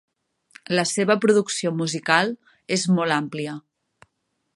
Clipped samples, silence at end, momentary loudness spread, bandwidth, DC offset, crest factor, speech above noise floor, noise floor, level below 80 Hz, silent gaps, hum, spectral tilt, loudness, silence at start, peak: under 0.1%; 0.95 s; 12 LU; 11.5 kHz; under 0.1%; 22 dB; 53 dB; -75 dBFS; -72 dBFS; none; none; -4 dB/octave; -22 LUFS; 0.7 s; -2 dBFS